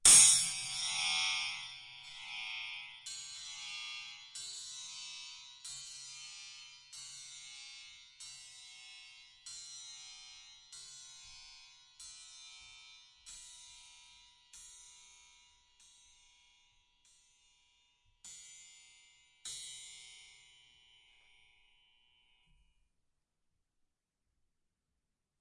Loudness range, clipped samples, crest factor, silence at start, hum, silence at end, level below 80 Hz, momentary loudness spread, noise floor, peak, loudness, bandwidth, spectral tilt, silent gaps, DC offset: 20 LU; under 0.1%; 30 dB; 0.05 s; none; 5.15 s; -74 dBFS; 21 LU; -86 dBFS; -10 dBFS; -33 LUFS; 11.5 kHz; 2.5 dB/octave; none; under 0.1%